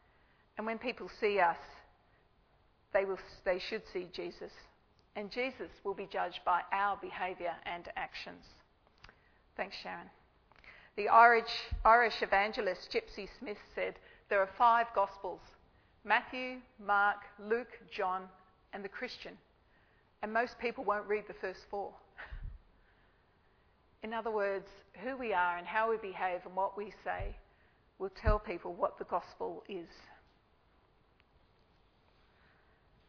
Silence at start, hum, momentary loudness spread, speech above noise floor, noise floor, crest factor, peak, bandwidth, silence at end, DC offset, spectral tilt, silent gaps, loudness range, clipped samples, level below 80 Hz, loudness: 0.55 s; none; 19 LU; 35 dB; -69 dBFS; 26 dB; -10 dBFS; 5.4 kHz; 2.95 s; under 0.1%; -2 dB/octave; none; 13 LU; under 0.1%; -52 dBFS; -34 LUFS